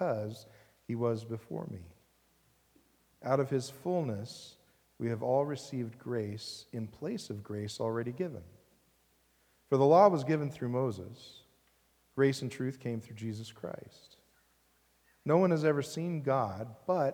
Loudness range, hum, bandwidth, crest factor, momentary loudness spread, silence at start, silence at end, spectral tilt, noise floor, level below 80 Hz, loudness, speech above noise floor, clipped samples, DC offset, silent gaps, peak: 8 LU; none; over 20 kHz; 24 dB; 17 LU; 0 s; 0 s; -7 dB/octave; -70 dBFS; -76 dBFS; -33 LUFS; 38 dB; under 0.1%; under 0.1%; none; -10 dBFS